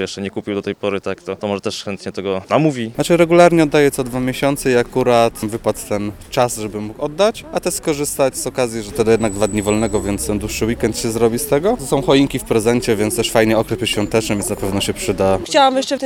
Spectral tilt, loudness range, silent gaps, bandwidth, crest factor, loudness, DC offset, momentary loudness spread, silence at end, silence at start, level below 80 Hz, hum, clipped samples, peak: -4.5 dB/octave; 4 LU; none; 18 kHz; 16 dB; -17 LUFS; under 0.1%; 10 LU; 0 s; 0 s; -38 dBFS; none; under 0.1%; 0 dBFS